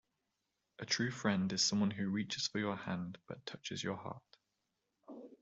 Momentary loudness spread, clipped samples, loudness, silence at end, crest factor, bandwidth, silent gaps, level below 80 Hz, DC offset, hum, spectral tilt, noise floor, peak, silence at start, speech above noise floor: 19 LU; under 0.1%; -37 LUFS; 0.05 s; 22 dB; 7.8 kHz; none; -76 dBFS; under 0.1%; none; -4 dB/octave; -86 dBFS; -18 dBFS; 0.8 s; 48 dB